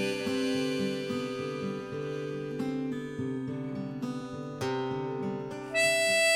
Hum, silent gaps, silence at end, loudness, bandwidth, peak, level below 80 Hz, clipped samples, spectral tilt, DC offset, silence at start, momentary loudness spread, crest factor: none; none; 0 s; -32 LUFS; 17.5 kHz; -14 dBFS; -66 dBFS; under 0.1%; -4 dB/octave; under 0.1%; 0 s; 11 LU; 18 dB